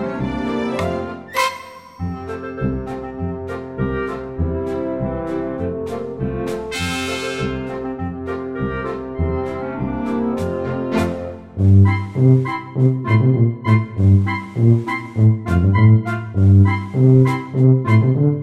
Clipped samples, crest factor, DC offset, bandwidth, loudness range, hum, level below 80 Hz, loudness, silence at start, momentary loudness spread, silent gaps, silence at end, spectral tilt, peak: under 0.1%; 16 dB; under 0.1%; 12 kHz; 9 LU; none; -38 dBFS; -18 LUFS; 0 s; 13 LU; none; 0 s; -8 dB/octave; -2 dBFS